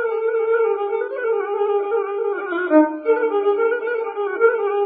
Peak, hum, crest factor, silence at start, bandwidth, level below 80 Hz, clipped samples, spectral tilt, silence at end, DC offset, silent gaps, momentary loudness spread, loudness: -2 dBFS; none; 16 dB; 0 s; 3.9 kHz; -74 dBFS; under 0.1%; -8 dB/octave; 0 s; under 0.1%; none; 7 LU; -20 LUFS